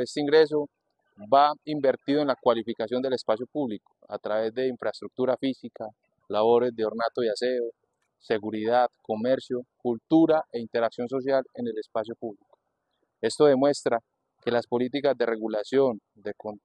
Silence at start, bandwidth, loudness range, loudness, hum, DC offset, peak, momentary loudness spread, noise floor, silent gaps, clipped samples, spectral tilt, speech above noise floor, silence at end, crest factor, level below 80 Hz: 0 s; 9.8 kHz; 3 LU; -26 LUFS; none; under 0.1%; -6 dBFS; 14 LU; -77 dBFS; none; under 0.1%; -5.5 dB/octave; 51 dB; 0.05 s; 20 dB; -74 dBFS